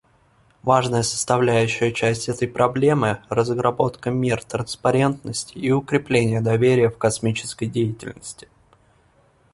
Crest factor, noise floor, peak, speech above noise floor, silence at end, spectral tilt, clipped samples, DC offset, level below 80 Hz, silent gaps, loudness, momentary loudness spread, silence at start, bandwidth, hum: 18 dB; -58 dBFS; -2 dBFS; 38 dB; 1.15 s; -5.5 dB/octave; under 0.1%; under 0.1%; -52 dBFS; none; -21 LUFS; 10 LU; 0.65 s; 11.5 kHz; none